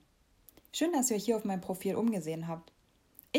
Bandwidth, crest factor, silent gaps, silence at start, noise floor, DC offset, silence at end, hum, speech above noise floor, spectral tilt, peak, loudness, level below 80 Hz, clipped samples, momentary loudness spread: 16 kHz; 18 dB; none; 0.75 s; -64 dBFS; under 0.1%; 0 s; none; 31 dB; -4.5 dB/octave; -16 dBFS; -33 LUFS; -70 dBFS; under 0.1%; 11 LU